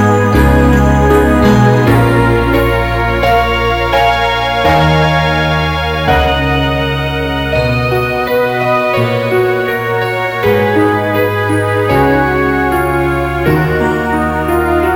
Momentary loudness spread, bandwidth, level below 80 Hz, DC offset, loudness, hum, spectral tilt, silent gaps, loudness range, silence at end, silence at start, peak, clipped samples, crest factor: 5 LU; 17 kHz; -22 dBFS; under 0.1%; -11 LUFS; none; -6.5 dB/octave; none; 3 LU; 0 s; 0 s; 0 dBFS; under 0.1%; 10 dB